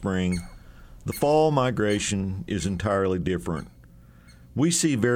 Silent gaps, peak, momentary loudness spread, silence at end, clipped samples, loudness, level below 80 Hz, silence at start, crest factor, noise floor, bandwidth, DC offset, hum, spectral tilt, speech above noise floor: none; -8 dBFS; 13 LU; 0 s; under 0.1%; -25 LUFS; -46 dBFS; 0 s; 16 dB; -50 dBFS; 17 kHz; under 0.1%; none; -5 dB/octave; 26 dB